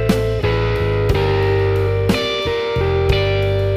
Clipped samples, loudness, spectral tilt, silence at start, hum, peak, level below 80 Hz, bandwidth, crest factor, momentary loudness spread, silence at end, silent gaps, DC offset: under 0.1%; -17 LUFS; -6.5 dB/octave; 0 s; none; -2 dBFS; -28 dBFS; 15 kHz; 14 dB; 2 LU; 0 s; none; under 0.1%